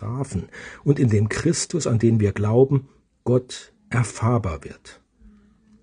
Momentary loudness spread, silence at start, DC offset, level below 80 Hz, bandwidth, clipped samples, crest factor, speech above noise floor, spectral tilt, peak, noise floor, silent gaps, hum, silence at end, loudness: 15 LU; 0 s; under 0.1%; -48 dBFS; 10 kHz; under 0.1%; 18 dB; 33 dB; -6.5 dB/octave; -4 dBFS; -54 dBFS; none; none; 0.9 s; -22 LUFS